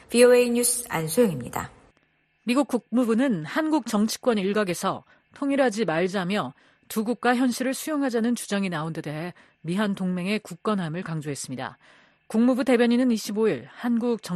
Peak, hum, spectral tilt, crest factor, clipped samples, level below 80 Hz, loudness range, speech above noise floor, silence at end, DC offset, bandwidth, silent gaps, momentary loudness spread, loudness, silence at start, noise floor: -6 dBFS; none; -4.5 dB/octave; 20 dB; under 0.1%; -64 dBFS; 4 LU; 43 dB; 0 s; under 0.1%; 13.5 kHz; none; 12 LU; -24 LUFS; 0.1 s; -67 dBFS